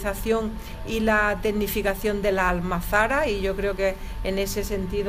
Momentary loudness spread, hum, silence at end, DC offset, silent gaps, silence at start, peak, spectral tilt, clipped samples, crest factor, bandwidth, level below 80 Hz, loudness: 7 LU; none; 0 s; under 0.1%; none; 0 s; -6 dBFS; -5 dB/octave; under 0.1%; 18 dB; 15.5 kHz; -34 dBFS; -24 LUFS